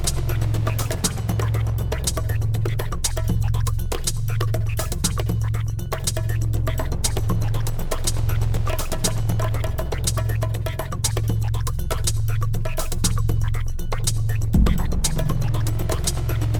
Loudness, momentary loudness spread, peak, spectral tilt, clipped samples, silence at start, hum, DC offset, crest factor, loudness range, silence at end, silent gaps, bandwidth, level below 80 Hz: -24 LUFS; 3 LU; -4 dBFS; -4.5 dB/octave; under 0.1%; 0 s; none; under 0.1%; 16 dB; 1 LU; 0 s; none; over 20 kHz; -26 dBFS